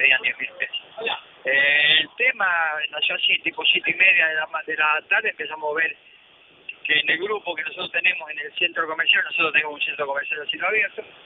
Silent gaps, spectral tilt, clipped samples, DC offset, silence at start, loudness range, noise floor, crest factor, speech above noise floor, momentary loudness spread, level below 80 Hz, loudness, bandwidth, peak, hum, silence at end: none; -5 dB/octave; under 0.1%; under 0.1%; 0 s; 5 LU; -53 dBFS; 20 dB; 30 dB; 12 LU; -74 dBFS; -20 LUFS; 4.6 kHz; -4 dBFS; none; 0.15 s